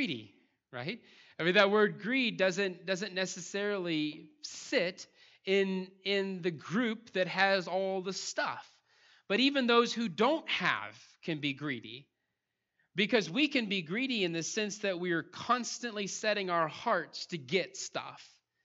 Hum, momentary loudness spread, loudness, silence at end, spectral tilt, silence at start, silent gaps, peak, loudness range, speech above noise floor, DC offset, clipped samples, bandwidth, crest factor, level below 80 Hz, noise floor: none; 14 LU; -32 LUFS; 0.4 s; -4 dB/octave; 0 s; none; -10 dBFS; 3 LU; 53 dB; under 0.1%; under 0.1%; 8.2 kHz; 24 dB; -86 dBFS; -86 dBFS